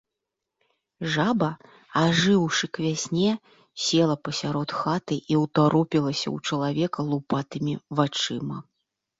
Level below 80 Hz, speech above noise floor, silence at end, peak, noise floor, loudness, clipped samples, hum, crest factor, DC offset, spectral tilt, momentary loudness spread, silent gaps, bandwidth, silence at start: -62 dBFS; 60 dB; 0.6 s; -8 dBFS; -85 dBFS; -25 LUFS; under 0.1%; none; 18 dB; under 0.1%; -5 dB/octave; 9 LU; none; 8 kHz; 1 s